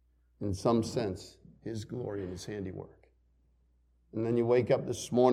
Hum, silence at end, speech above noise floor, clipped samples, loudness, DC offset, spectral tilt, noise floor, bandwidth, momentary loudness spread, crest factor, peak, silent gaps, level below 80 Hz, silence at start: none; 0 s; 38 dB; under 0.1%; -33 LUFS; under 0.1%; -6.5 dB/octave; -69 dBFS; 14 kHz; 17 LU; 22 dB; -12 dBFS; none; -62 dBFS; 0.4 s